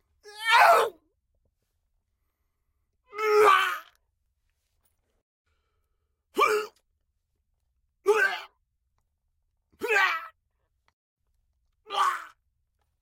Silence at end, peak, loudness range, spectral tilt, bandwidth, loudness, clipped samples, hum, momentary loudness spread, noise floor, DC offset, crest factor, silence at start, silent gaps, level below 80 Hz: 0.75 s; -8 dBFS; 7 LU; -0.5 dB/octave; 16.5 kHz; -23 LUFS; under 0.1%; none; 18 LU; -77 dBFS; under 0.1%; 22 dB; 0.25 s; 5.22-5.45 s, 10.93-11.16 s; -76 dBFS